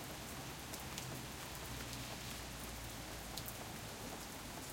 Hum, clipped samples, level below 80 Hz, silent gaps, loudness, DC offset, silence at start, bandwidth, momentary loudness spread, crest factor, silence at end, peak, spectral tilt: none; under 0.1%; -58 dBFS; none; -47 LUFS; under 0.1%; 0 s; 17 kHz; 2 LU; 24 dB; 0 s; -22 dBFS; -3 dB/octave